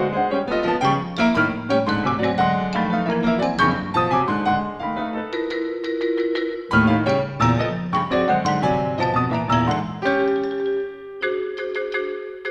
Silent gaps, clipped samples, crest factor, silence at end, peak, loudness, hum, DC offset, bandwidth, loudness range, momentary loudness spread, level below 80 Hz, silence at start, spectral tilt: none; under 0.1%; 16 dB; 0 s; -4 dBFS; -21 LUFS; none; under 0.1%; 9 kHz; 2 LU; 8 LU; -46 dBFS; 0 s; -7 dB/octave